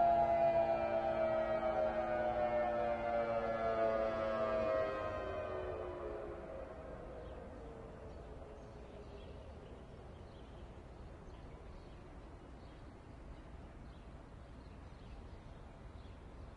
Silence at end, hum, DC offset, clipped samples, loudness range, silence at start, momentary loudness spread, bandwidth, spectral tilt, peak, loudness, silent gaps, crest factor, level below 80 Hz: 0 s; none; under 0.1%; under 0.1%; 18 LU; 0 s; 20 LU; 9 kHz; -7.5 dB/octave; -22 dBFS; -37 LUFS; none; 18 dB; -56 dBFS